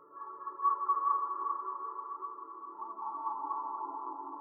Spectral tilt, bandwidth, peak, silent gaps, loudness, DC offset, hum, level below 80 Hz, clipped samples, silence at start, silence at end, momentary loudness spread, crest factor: -7.5 dB/octave; 2.1 kHz; -18 dBFS; none; -36 LUFS; under 0.1%; none; under -90 dBFS; under 0.1%; 0 s; 0 s; 13 LU; 18 dB